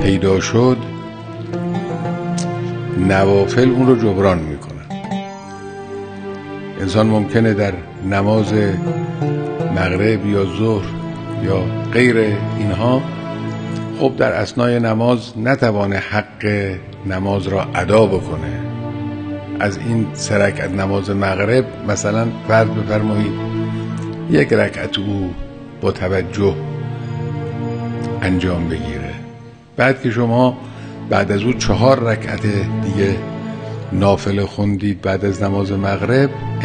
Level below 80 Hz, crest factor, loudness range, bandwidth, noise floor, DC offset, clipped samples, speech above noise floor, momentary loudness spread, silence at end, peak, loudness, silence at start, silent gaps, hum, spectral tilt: -40 dBFS; 18 dB; 4 LU; 9.8 kHz; -37 dBFS; under 0.1%; under 0.1%; 22 dB; 12 LU; 0 s; 0 dBFS; -17 LUFS; 0 s; none; none; -6.5 dB/octave